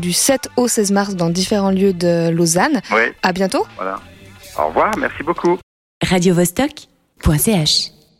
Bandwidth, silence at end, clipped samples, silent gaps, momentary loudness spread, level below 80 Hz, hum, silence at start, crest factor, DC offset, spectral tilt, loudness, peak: 16.5 kHz; 0.3 s; under 0.1%; 5.63-6.01 s; 8 LU; -38 dBFS; none; 0 s; 16 dB; under 0.1%; -4 dB/octave; -16 LUFS; 0 dBFS